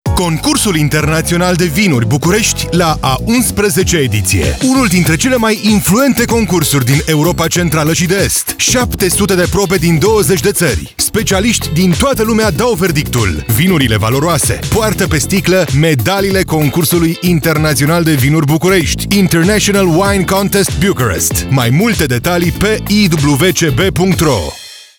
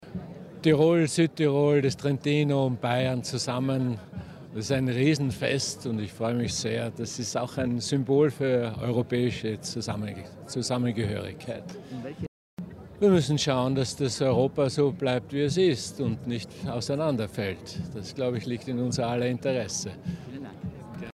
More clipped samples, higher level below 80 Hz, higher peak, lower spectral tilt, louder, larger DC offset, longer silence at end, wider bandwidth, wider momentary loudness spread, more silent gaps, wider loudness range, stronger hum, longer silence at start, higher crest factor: neither; first, -28 dBFS vs -58 dBFS; first, -2 dBFS vs -8 dBFS; about the same, -4.5 dB/octave vs -5.5 dB/octave; first, -11 LUFS vs -27 LUFS; neither; about the same, 0.15 s vs 0.05 s; first, over 20 kHz vs 13 kHz; second, 3 LU vs 15 LU; second, none vs 12.28-12.57 s; second, 1 LU vs 6 LU; neither; about the same, 0.05 s vs 0 s; second, 10 dB vs 18 dB